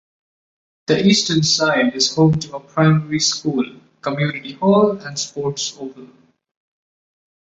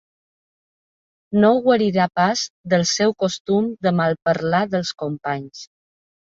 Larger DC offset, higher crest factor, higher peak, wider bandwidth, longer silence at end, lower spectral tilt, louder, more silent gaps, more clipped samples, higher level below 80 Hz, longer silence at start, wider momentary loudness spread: neither; about the same, 16 dB vs 18 dB; about the same, -2 dBFS vs -2 dBFS; about the same, 8.2 kHz vs 7.8 kHz; first, 1.35 s vs 0.75 s; about the same, -4.5 dB/octave vs -5 dB/octave; first, -17 LUFS vs -20 LUFS; second, none vs 2.50-2.64 s, 3.40-3.45 s; neither; first, -54 dBFS vs -60 dBFS; second, 0.9 s vs 1.3 s; about the same, 11 LU vs 10 LU